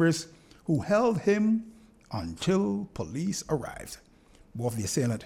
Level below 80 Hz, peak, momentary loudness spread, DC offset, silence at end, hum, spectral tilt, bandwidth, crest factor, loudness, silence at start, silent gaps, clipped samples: -56 dBFS; -12 dBFS; 18 LU; under 0.1%; 0 s; none; -5.5 dB/octave; 16 kHz; 16 dB; -29 LUFS; 0 s; none; under 0.1%